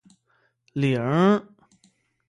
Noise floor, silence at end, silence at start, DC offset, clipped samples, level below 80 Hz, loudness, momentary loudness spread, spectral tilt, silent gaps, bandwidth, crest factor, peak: -68 dBFS; 0.85 s; 0.75 s; under 0.1%; under 0.1%; -66 dBFS; -22 LUFS; 8 LU; -8 dB/octave; none; 10.5 kHz; 18 dB; -6 dBFS